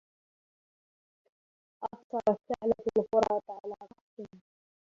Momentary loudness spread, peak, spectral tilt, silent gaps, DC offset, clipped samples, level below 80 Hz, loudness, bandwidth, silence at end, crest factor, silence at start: 20 LU; -12 dBFS; -6.5 dB/octave; 2.04-2.10 s, 4.01-4.17 s; under 0.1%; under 0.1%; -68 dBFS; -31 LUFS; 7.8 kHz; 0.6 s; 22 dB; 1.8 s